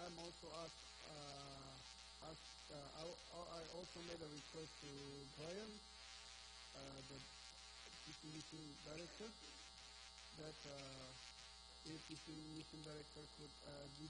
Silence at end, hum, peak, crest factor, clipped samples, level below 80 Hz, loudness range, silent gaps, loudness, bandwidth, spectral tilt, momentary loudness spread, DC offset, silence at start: 0 s; none; -38 dBFS; 18 dB; under 0.1%; -72 dBFS; 2 LU; none; -56 LUFS; 10 kHz; -3.5 dB/octave; 4 LU; under 0.1%; 0 s